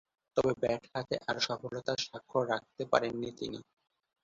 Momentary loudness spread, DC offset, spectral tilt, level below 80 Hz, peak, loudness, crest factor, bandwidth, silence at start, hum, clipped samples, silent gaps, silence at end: 8 LU; under 0.1%; -3 dB/octave; -66 dBFS; -10 dBFS; -34 LUFS; 26 dB; 7.6 kHz; 0.35 s; none; under 0.1%; none; 0.6 s